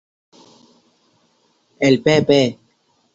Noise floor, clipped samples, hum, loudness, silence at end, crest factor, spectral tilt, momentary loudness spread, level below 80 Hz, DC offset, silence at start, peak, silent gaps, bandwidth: -62 dBFS; under 0.1%; none; -16 LUFS; 0.6 s; 20 dB; -5.5 dB/octave; 6 LU; -58 dBFS; under 0.1%; 1.8 s; -2 dBFS; none; 7.8 kHz